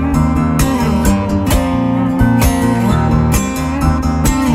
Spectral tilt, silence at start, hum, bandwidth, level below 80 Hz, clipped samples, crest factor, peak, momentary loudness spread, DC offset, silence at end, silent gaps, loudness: -6 dB/octave; 0 s; none; 16.5 kHz; -20 dBFS; under 0.1%; 12 dB; 0 dBFS; 3 LU; under 0.1%; 0 s; none; -14 LUFS